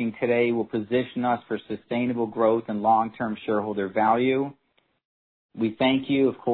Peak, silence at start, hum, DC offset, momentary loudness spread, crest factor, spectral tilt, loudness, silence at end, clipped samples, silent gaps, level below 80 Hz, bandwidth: -8 dBFS; 0 s; none; under 0.1%; 7 LU; 16 dB; -10 dB/octave; -25 LUFS; 0 s; under 0.1%; 5.05-5.49 s; -66 dBFS; 4.4 kHz